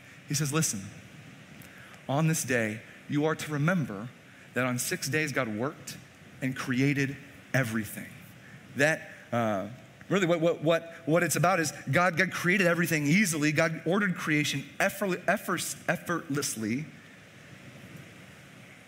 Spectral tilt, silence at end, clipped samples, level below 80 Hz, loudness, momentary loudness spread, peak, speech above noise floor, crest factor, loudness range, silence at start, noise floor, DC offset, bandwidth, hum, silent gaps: -4.5 dB/octave; 0.1 s; under 0.1%; -70 dBFS; -28 LUFS; 22 LU; -8 dBFS; 23 dB; 22 dB; 6 LU; 0 s; -51 dBFS; under 0.1%; 16 kHz; none; none